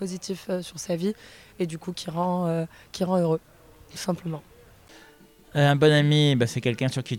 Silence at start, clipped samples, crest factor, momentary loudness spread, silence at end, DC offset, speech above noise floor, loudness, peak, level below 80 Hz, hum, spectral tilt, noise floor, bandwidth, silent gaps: 0 s; under 0.1%; 18 dB; 14 LU; 0 s; under 0.1%; 29 dB; -25 LUFS; -6 dBFS; -60 dBFS; none; -6 dB/octave; -53 dBFS; 15.5 kHz; none